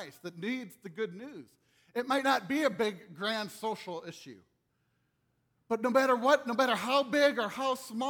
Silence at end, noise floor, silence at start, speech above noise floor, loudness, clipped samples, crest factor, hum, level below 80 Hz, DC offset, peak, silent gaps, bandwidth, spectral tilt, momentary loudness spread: 0 s; -77 dBFS; 0 s; 45 dB; -31 LUFS; under 0.1%; 20 dB; none; -78 dBFS; under 0.1%; -12 dBFS; none; 19.5 kHz; -4 dB/octave; 17 LU